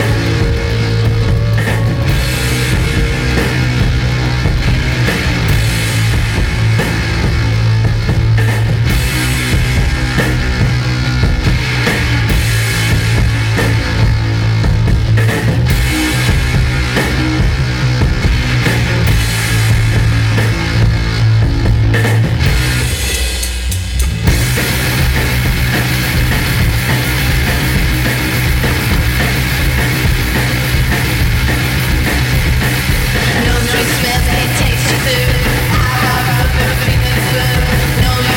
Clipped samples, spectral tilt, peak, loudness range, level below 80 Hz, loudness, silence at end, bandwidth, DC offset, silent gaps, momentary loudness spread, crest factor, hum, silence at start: under 0.1%; -5 dB/octave; 0 dBFS; 1 LU; -18 dBFS; -13 LUFS; 0 s; 16.5 kHz; under 0.1%; none; 2 LU; 12 dB; none; 0 s